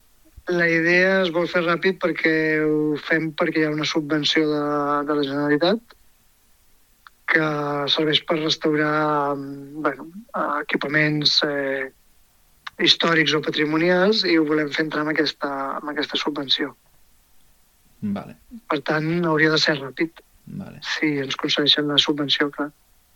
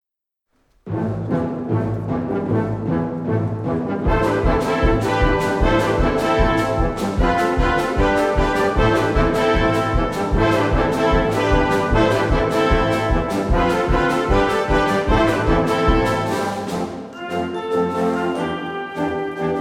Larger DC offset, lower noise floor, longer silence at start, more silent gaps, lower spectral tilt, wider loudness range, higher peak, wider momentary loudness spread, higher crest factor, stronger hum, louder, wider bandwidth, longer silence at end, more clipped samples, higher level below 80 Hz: neither; second, -57 dBFS vs -79 dBFS; second, 0.45 s vs 0.85 s; neither; second, -4.5 dB/octave vs -6.5 dB/octave; about the same, 5 LU vs 5 LU; first, 0 dBFS vs -4 dBFS; first, 12 LU vs 7 LU; first, 22 dB vs 14 dB; neither; about the same, -21 LUFS vs -19 LUFS; about the same, 16 kHz vs 15.5 kHz; first, 0.45 s vs 0 s; neither; second, -60 dBFS vs -26 dBFS